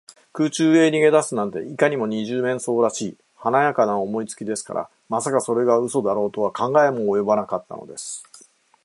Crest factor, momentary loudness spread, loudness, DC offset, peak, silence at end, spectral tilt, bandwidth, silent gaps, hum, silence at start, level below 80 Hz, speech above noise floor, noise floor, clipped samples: 18 dB; 13 LU; -21 LUFS; under 0.1%; -4 dBFS; 0.6 s; -5 dB/octave; 11.5 kHz; none; none; 0.35 s; -68 dBFS; 30 dB; -51 dBFS; under 0.1%